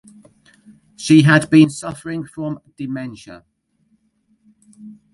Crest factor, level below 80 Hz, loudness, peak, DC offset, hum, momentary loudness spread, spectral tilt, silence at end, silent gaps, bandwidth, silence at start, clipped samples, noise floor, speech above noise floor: 18 dB; -58 dBFS; -16 LUFS; 0 dBFS; under 0.1%; none; 18 LU; -6 dB/octave; 0.2 s; none; 11.5 kHz; 1 s; under 0.1%; -63 dBFS; 47 dB